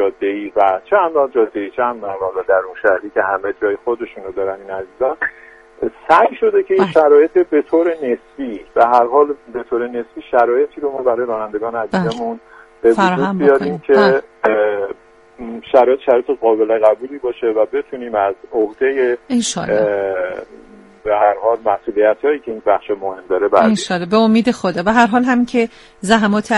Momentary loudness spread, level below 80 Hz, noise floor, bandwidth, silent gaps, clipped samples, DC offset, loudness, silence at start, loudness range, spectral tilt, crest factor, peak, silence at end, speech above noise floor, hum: 11 LU; -52 dBFS; -34 dBFS; 11.5 kHz; none; under 0.1%; under 0.1%; -16 LUFS; 0 s; 4 LU; -5.5 dB/octave; 16 dB; 0 dBFS; 0 s; 19 dB; none